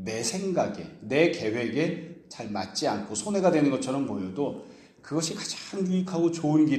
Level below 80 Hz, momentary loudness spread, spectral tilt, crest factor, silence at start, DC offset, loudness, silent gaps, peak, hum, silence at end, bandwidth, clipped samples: -68 dBFS; 10 LU; -5 dB/octave; 20 dB; 0 s; under 0.1%; -28 LUFS; none; -8 dBFS; none; 0 s; 12.5 kHz; under 0.1%